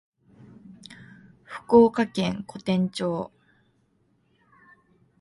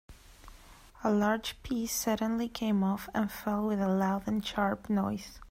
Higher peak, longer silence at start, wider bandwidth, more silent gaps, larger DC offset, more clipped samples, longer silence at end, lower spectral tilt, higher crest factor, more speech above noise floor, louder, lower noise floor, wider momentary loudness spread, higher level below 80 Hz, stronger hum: first, -4 dBFS vs -16 dBFS; first, 0.9 s vs 0.1 s; second, 11.5 kHz vs 16 kHz; neither; neither; neither; first, 1.95 s vs 0 s; first, -7 dB/octave vs -5 dB/octave; first, 22 dB vs 16 dB; first, 45 dB vs 23 dB; first, -23 LUFS vs -31 LUFS; first, -67 dBFS vs -54 dBFS; first, 27 LU vs 6 LU; second, -62 dBFS vs -54 dBFS; neither